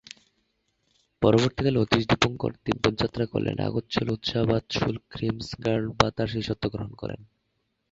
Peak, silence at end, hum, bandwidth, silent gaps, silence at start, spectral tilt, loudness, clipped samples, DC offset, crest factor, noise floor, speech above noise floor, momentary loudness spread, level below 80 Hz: -2 dBFS; 0.65 s; none; 7.8 kHz; none; 1.2 s; -6 dB/octave; -26 LUFS; under 0.1%; under 0.1%; 24 dB; -76 dBFS; 50 dB; 9 LU; -48 dBFS